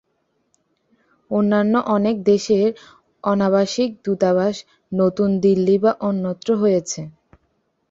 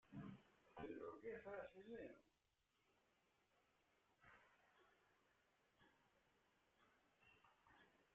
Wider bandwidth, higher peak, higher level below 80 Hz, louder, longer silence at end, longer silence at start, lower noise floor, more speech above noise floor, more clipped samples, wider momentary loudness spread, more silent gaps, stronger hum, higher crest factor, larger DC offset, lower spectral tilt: first, 7.8 kHz vs 6.8 kHz; first, -4 dBFS vs -42 dBFS; first, -60 dBFS vs -86 dBFS; first, -19 LUFS vs -58 LUFS; first, 0.8 s vs 0 s; first, 1.3 s vs 0.05 s; second, -69 dBFS vs -87 dBFS; first, 51 dB vs 31 dB; neither; first, 10 LU vs 7 LU; neither; neither; about the same, 16 dB vs 20 dB; neither; about the same, -6.5 dB/octave vs -5.5 dB/octave